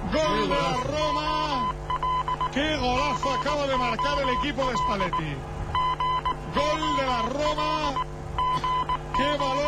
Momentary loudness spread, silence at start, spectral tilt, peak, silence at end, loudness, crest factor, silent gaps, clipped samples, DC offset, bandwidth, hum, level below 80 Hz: 4 LU; 0 s; -4.5 dB/octave; -12 dBFS; 0 s; -26 LUFS; 14 dB; none; under 0.1%; under 0.1%; 13.5 kHz; none; -38 dBFS